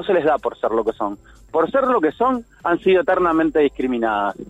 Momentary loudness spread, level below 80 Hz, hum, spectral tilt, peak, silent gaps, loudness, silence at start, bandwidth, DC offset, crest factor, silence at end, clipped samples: 7 LU; -48 dBFS; none; -7 dB/octave; -6 dBFS; none; -19 LUFS; 0 s; 8.2 kHz; under 0.1%; 14 dB; 0.05 s; under 0.1%